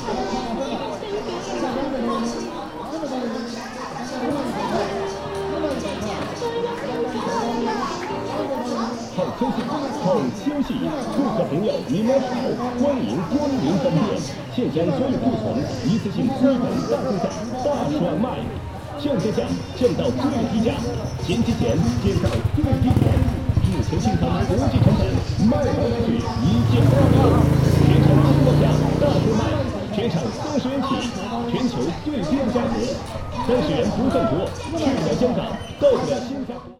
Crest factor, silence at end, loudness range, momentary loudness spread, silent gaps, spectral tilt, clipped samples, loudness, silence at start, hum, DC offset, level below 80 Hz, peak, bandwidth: 18 dB; 0.05 s; 9 LU; 10 LU; none; -7 dB/octave; under 0.1%; -22 LUFS; 0 s; none; under 0.1%; -38 dBFS; -2 dBFS; 16 kHz